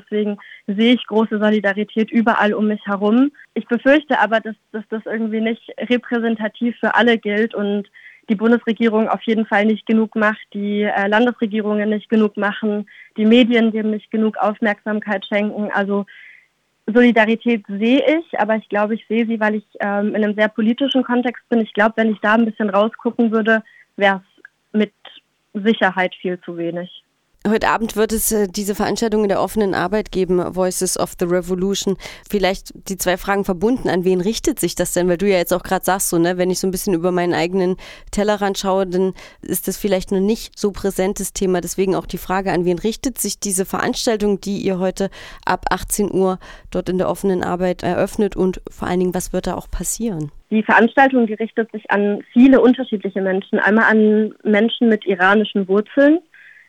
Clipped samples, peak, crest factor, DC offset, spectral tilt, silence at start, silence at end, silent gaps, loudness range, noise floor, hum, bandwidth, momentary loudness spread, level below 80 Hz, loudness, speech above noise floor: under 0.1%; -2 dBFS; 16 dB; under 0.1%; -4.5 dB/octave; 0.1 s; 0.5 s; none; 5 LU; -57 dBFS; none; 17 kHz; 9 LU; -42 dBFS; -18 LUFS; 39 dB